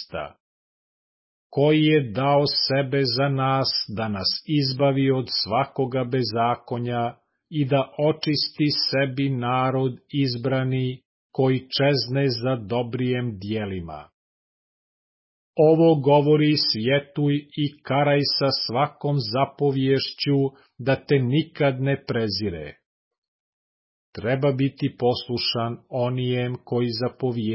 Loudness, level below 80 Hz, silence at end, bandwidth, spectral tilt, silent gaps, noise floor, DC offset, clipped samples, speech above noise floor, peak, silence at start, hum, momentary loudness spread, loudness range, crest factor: -23 LUFS; -56 dBFS; 0 s; 5.8 kHz; -9.5 dB/octave; 0.40-1.50 s, 11.05-11.30 s, 14.14-15.53 s, 22.86-23.11 s, 23.18-23.22 s, 23.28-24.13 s; under -90 dBFS; under 0.1%; under 0.1%; over 68 dB; -8 dBFS; 0 s; none; 10 LU; 6 LU; 16 dB